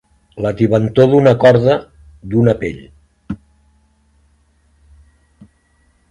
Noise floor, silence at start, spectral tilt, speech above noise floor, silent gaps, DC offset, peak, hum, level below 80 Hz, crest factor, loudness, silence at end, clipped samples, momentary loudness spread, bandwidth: -57 dBFS; 0.35 s; -8.5 dB/octave; 45 dB; none; under 0.1%; 0 dBFS; none; -44 dBFS; 16 dB; -13 LUFS; 2.75 s; under 0.1%; 21 LU; 10.5 kHz